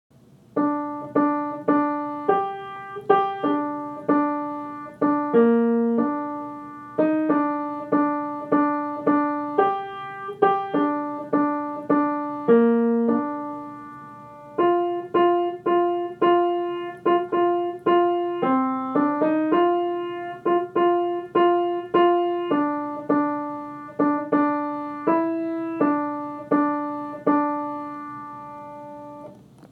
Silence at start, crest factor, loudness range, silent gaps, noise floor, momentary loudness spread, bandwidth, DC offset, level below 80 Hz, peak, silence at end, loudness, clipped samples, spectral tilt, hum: 0.55 s; 18 dB; 3 LU; none; -44 dBFS; 13 LU; 4.5 kHz; under 0.1%; -72 dBFS; -6 dBFS; 0.05 s; -23 LUFS; under 0.1%; -8.5 dB/octave; none